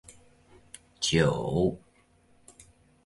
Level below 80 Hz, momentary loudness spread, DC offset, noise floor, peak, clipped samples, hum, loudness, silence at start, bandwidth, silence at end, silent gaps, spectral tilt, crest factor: -52 dBFS; 26 LU; under 0.1%; -63 dBFS; -10 dBFS; under 0.1%; none; -27 LUFS; 0.1 s; 11.5 kHz; 1.3 s; none; -5 dB/octave; 22 dB